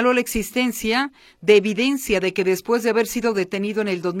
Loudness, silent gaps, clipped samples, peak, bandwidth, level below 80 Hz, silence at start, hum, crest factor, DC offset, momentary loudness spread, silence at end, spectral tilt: -21 LUFS; none; under 0.1%; -2 dBFS; 16.5 kHz; -46 dBFS; 0 s; none; 18 dB; under 0.1%; 7 LU; 0 s; -4 dB/octave